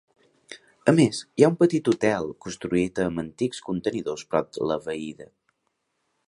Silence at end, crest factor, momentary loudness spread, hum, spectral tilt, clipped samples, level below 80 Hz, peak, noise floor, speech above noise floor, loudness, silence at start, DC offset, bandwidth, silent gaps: 1.05 s; 22 dB; 14 LU; none; -6 dB/octave; under 0.1%; -58 dBFS; -2 dBFS; -76 dBFS; 52 dB; -24 LUFS; 0.5 s; under 0.1%; 11.5 kHz; none